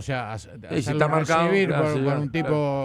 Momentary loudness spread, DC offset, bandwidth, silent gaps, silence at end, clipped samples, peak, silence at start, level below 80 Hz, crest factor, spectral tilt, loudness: 10 LU; under 0.1%; 11.5 kHz; none; 0 s; under 0.1%; -6 dBFS; 0 s; -52 dBFS; 16 dB; -6.5 dB/octave; -23 LUFS